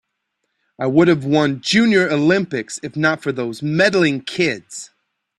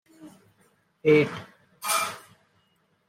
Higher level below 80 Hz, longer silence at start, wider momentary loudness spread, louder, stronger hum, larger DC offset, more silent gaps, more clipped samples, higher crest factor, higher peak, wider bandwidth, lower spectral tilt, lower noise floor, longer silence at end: first, -58 dBFS vs -74 dBFS; first, 0.8 s vs 0.2 s; second, 11 LU vs 18 LU; first, -17 LUFS vs -25 LUFS; neither; neither; neither; neither; about the same, 16 dB vs 20 dB; first, -2 dBFS vs -8 dBFS; second, 12 kHz vs 16.5 kHz; about the same, -5 dB/octave vs -4 dB/octave; first, -74 dBFS vs -68 dBFS; second, 0.55 s vs 0.9 s